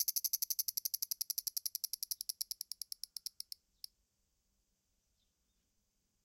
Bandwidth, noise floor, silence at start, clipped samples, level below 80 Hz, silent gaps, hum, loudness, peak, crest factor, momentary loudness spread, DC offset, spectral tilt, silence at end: 17 kHz; -82 dBFS; 0 s; under 0.1%; -84 dBFS; none; none; -38 LUFS; -16 dBFS; 28 dB; 15 LU; under 0.1%; 5 dB/octave; 3.8 s